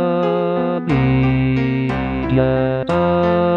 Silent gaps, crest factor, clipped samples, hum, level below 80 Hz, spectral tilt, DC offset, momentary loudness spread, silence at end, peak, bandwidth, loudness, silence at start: none; 14 dB; under 0.1%; none; -34 dBFS; -9.5 dB/octave; 0.2%; 4 LU; 0 s; -2 dBFS; 5.6 kHz; -17 LUFS; 0 s